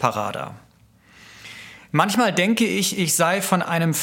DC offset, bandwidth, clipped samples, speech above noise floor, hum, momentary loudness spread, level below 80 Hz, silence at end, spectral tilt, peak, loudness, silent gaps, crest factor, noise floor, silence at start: under 0.1%; 17 kHz; under 0.1%; 34 dB; none; 20 LU; -64 dBFS; 0 s; -4 dB/octave; -2 dBFS; -20 LUFS; none; 20 dB; -54 dBFS; 0 s